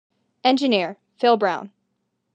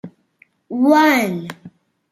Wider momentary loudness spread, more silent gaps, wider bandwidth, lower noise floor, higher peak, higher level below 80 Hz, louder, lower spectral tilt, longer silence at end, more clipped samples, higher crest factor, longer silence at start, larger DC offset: second, 10 LU vs 16 LU; neither; second, 9 kHz vs 16 kHz; first, -74 dBFS vs -57 dBFS; about the same, -4 dBFS vs -2 dBFS; second, -86 dBFS vs -68 dBFS; second, -21 LUFS vs -15 LUFS; about the same, -5 dB/octave vs -5 dB/octave; first, 0.7 s vs 0.45 s; neither; about the same, 20 dB vs 18 dB; first, 0.45 s vs 0.05 s; neither